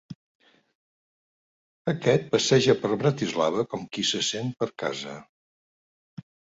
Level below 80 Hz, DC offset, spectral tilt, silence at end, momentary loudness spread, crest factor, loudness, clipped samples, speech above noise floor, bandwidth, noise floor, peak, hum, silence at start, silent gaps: -66 dBFS; under 0.1%; -4.5 dB/octave; 1.35 s; 12 LU; 20 dB; -25 LUFS; under 0.1%; over 65 dB; 8 kHz; under -90 dBFS; -6 dBFS; none; 0.1 s; 0.15-0.40 s, 0.75-1.85 s